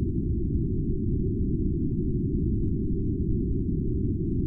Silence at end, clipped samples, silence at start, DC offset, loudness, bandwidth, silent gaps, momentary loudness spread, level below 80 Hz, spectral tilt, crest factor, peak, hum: 0 s; under 0.1%; 0 s; under 0.1%; -28 LUFS; 0.5 kHz; none; 1 LU; -32 dBFS; -16 dB/octave; 10 dB; -16 dBFS; none